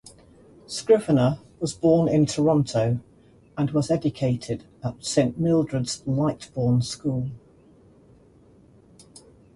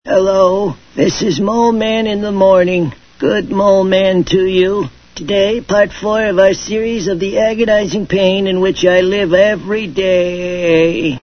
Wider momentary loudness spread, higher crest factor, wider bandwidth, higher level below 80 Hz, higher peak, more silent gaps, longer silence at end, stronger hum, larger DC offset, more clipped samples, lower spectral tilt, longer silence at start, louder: first, 12 LU vs 7 LU; first, 18 dB vs 12 dB; first, 11.5 kHz vs 6.6 kHz; second, -54 dBFS vs -40 dBFS; second, -6 dBFS vs 0 dBFS; neither; first, 2.2 s vs 0.05 s; neither; neither; neither; about the same, -6.5 dB/octave vs -5.5 dB/octave; about the same, 0.05 s vs 0.05 s; second, -24 LUFS vs -13 LUFS